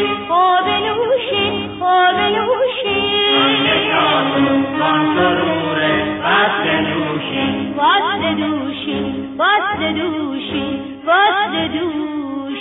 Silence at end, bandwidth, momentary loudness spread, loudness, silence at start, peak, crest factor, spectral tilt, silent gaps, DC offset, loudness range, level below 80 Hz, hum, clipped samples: 0 s; 4 kHz; 8 LU; -16 LUFS; 0 s; -4 dBFS; 14 dB; -8 dB/octave; none; under 0.1%; 3 LU; -50 dBFS; none; under 0.1%